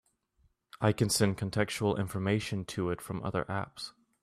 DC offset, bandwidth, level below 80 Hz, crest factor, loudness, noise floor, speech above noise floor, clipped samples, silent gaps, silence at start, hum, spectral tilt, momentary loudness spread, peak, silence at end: under 0.1%; 15 kHz; -60 dBFS; 20 dB; -32 LUFS; -71 dBFS; 40 dB; under 0.1%; none; 0.75 s; none; -5 dB/octave; 9 LU; -12 dBFS; 0.35 s